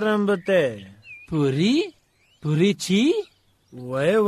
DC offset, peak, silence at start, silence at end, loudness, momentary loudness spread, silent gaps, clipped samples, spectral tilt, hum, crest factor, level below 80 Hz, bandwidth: under 0.1%; -8 dBFS; 0 s; 0 s; -22 LUFS; 19 LU; none; under 0.1%; -6 dB/octave; none; 14 dB; -60 dBFS; 13.5 kHz